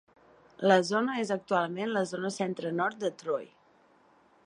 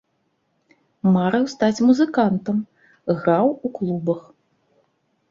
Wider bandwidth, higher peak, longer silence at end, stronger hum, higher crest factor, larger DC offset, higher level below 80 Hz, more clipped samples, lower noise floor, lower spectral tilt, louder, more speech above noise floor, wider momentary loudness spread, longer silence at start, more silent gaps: first, 11 kHz vs 7.6 kHz; second, -8 dBFS vs -4 dBFS; about the same, 1 s vs 1.1 s; neither; first, 22 dB vs 16 dB; neither; second, -78 dBFS vs -62 dBFS; neither; second, -63 dBFS vs -69 dBFS; second, -5 dB/octave vs -7.5 dB/octave; second, -30 LUFS vs -20 LUFS; second, 34 dB vs 50 dB; about the same, 10 LU vs 9 LU; second, 0.6 s vs 1.05 s; neither